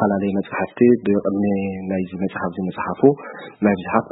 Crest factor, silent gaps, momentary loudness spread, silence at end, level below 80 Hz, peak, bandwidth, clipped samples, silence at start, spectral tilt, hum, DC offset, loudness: 18 dB; none; 9 LU; 0 s; -56 dBFS; 0 dBFS; 4 kHz; under 0.1%; 0 s; -13 dB/octave; none; under 0.1%; -20 LUFS